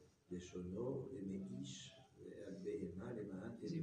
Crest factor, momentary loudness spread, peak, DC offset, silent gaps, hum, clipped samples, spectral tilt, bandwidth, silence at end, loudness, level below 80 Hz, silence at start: 14 dB; 9 LU; -34 dBFS; under 0.1%; none; none; under 0.1%; -6.5 dB/octave; 10 kHz; 0 s; -49 LUFS; -74 dBFS; 0 s